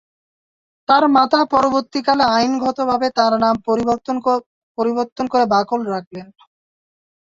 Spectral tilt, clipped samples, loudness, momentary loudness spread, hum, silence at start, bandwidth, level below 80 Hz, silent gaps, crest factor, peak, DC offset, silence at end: -5 dB/octave; under 0.1%; -17 LUFS; 10 LU; none; 0.9 s; 7.8 kHz; -56 dBFS; 4.46-4.75 s, 5.12-5.16 s, 6.07-6.11 s; 16 dB; -2 dBFS; under 0.1%; 1.15 s